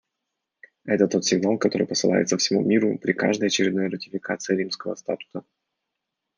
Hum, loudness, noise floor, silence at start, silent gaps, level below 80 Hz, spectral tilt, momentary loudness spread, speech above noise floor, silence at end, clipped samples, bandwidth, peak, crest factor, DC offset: none; -23 LUFS; -82 dBFS; 0.85 s; none; -72 dBFS; -4 dB/octave; 10 LU; 59 dB; 0.95 s; under 0.1%; 10 kHz; -4 dBFS; 20 dB; under 0.1%